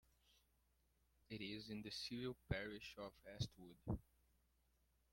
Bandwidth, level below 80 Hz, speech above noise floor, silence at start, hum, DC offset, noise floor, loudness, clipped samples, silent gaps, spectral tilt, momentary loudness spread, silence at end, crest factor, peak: 16.5 kHz; -66 dBFS; 31 dB; 1.3 s; none; under 0.1%; -81 dBFS; -51 LUFS; under 0.1%; none; -5.5 dB/octave; 9 LU; 1.1 s; 24 dB; -28 dBFS